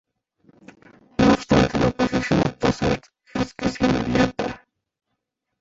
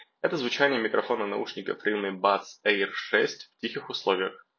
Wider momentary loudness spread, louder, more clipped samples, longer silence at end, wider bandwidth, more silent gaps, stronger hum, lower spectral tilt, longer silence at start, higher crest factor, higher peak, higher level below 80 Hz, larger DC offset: first, 12 LU vs 8 LU; first, -21 LUFS vs -27 LUFS; neither; first, 1.05 s vs 0.2 s; first, 8 kHz vs 7 kHz; neither; neither; first, -6 dB/octave vs -4 dB/octave; first, 1.2 s vs 0 s; about the same, 20 dB vs 22 dB; about the same, -4 dBFS vs -6 dBFS; first, -40 dBFS vs -78 dBFS; neither